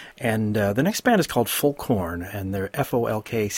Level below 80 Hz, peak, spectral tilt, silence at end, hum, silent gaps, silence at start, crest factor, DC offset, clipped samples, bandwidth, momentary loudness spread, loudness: -50 dBFS; -6 dBFS; -5 dB/octave; 0 s; none; none; 0 s; 18 dB; under 0.1%; under 0.1%; 17 kHz; 8 LU; -23 LUFS